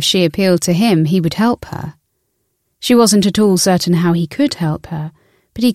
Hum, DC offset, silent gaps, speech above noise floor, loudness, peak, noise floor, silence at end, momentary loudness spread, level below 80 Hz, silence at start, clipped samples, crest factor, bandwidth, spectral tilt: none; under 0.1%; none; 54 dB; -14 LUFS; 0 dBFS; -67 dBFS; 0 s; 15 LU; -46 dBFS; 0 s; under 0.1%; 14 dB; 15.5 kHz; -5 dB/octave